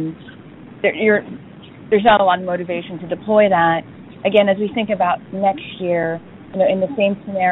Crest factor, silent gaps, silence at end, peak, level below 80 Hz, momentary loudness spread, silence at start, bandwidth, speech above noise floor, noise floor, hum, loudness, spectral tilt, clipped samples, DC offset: 18 dB; none; 0 s; 0 dBFS; -54 dBFS; 13 LU; 0 s; 4.1 kHz; 22 dB; -39 dBFS; none; -18 LUFS; -3.5 dB/octave; under 0.1%; under 0.1%